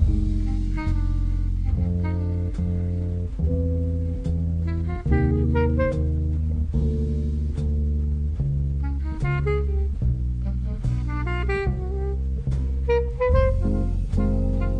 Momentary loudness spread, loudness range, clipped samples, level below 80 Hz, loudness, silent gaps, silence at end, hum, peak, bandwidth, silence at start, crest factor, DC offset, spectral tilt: 5 LU; 2 LU; under 0.1%; -24 dBFS; -25 LUFS; none; 0 s; none; -6 dBFS; 5.6 kHz; 0 s; 16 dB; under 0.1%; -9.5 dB/octave